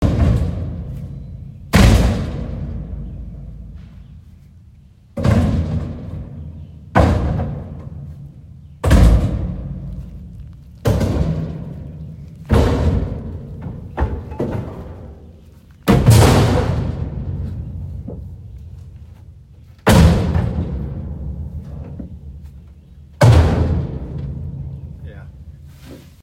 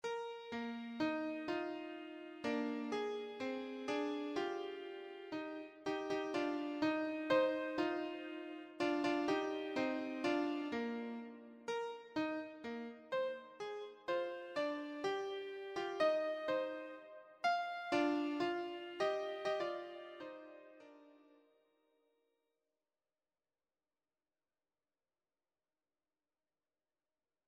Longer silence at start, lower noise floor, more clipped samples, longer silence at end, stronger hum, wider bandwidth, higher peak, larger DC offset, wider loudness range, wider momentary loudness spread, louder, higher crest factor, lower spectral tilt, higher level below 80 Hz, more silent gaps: about the same, 0 s vs 0.05 s; second, -45 dBFS vs under -90 dBFS; neither; second, 0.15 s vs 6.3 s; neither; first, 16 kHz vs 9.6 kHz; first, 0 dBFS vs -22 dBFS; neither; about the same, 7 LU vs 5 LU; first, 24 LU vs 13 LU; first, -18 LUFS vs -41 LUFS; about the same, 18 dB vs 20 dB; first, -6.5 dB/octave vs -4.5 dB/octave; first, -24 dBFS vs -82 dBFS; neither